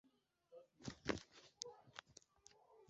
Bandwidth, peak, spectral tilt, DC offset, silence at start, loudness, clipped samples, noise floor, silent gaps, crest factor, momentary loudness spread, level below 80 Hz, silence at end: 8 kHz; -20 dBFS; -3.5 dB/octave; under 0.1%; 0.05 s; -51 LUFS; under 0.1%; -75 dBFS; none; 34 dB; 20 LU; -72 dBFS; 0 s